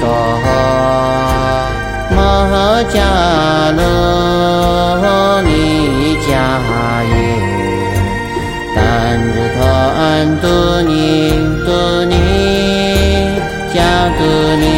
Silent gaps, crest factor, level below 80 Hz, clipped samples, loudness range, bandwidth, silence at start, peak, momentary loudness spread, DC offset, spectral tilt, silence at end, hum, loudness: none; 12 dB; -22 dBFS; under 0.1%; 3 LU; 16.5 kHz; 0 s; 0 dBFS; 4 LU; under 0.1%; -6 dB/octave; 0 s; none; -12 LUFS